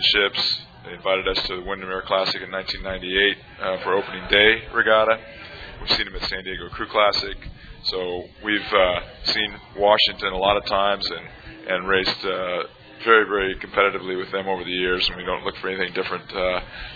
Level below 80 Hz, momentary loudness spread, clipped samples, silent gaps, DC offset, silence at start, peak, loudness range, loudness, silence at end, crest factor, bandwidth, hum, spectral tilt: -44 dBFS; 12 LU; under 0.1%; none; under 0.1%; 0 s; -2 dBFS; 4 LU; -21 LUFS; 0 s; 22 dB; 5 kHz; none; -4.5 dB/octave